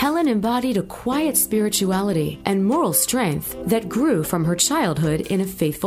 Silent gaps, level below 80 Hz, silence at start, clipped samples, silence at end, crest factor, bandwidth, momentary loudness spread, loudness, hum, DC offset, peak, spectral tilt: none; -46 dBFS; 0 s; under 0.1%; 0 s; 16 dB; 16 kHz; 6 LU; -20 LUFS; none; under 0.1%; -4 dBFS; -4.5 dB/octave